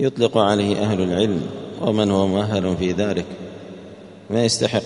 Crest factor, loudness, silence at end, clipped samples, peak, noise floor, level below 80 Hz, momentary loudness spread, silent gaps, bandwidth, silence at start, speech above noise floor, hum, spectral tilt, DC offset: 18 dB; -20 LUFS; 0 s; under 0.1%; -2 dBFS; -40 dBFS; -52 dBFS; 17 LU; none; 11 kHz; 0 s; 20 dB; none; -5.5 dB/octave; under 0.1%